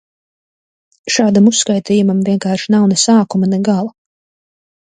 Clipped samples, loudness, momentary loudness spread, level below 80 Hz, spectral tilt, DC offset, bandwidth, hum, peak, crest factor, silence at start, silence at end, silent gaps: under 0.1%; -13 LUFS; 7 LU; -60 dBFS; -4.5 dB/octave; under 0.1%; 9.6 kHz; none; 0 dBFS; 14 dB; 1.05 s; 1.05 s; none